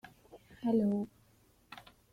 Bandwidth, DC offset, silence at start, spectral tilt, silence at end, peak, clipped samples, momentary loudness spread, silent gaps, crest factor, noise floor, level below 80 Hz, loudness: 13 kHz; under 0.1%; 0.05 s; -8.5 dB/octave; 0.3 s; -20 dBFS; under 0.1%; 23 LU; none; 18 dB; -67 dBFS; -70 dBFS; -34 LUFS